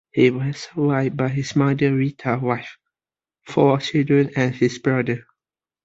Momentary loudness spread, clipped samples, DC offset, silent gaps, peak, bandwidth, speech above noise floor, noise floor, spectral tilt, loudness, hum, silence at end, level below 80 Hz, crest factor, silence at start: 8 LU; under 0.1%; under 0.1%; none; -2 dBFS; 7.8 kHz; over 70 dB; under -90 dBFS; -7 dB/octave; -21 LUFS; none; 0.65 s; -58 dBFS; 18 dB; 0.15 s